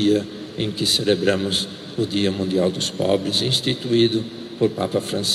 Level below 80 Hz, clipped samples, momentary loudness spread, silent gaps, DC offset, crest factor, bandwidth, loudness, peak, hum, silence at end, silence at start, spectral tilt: -56 dBFS; under 0.1%; 8 LU; none; under 0.1%; 16 dB; 15.5 kHz; -21 LUFS; -6 dBFS; none; 0 s; 0 s; -4.5 dB/octave